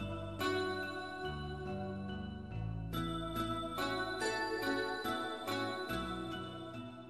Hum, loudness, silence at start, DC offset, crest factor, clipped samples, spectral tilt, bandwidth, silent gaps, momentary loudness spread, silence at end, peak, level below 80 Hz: none; -39 LUFS; 0 s; under 0.1%; 16 dB; under 0.1%; -5 dB/octave; 15 kHz; none; 7 LU; 0 s; -24 dBFS; -54 dBFS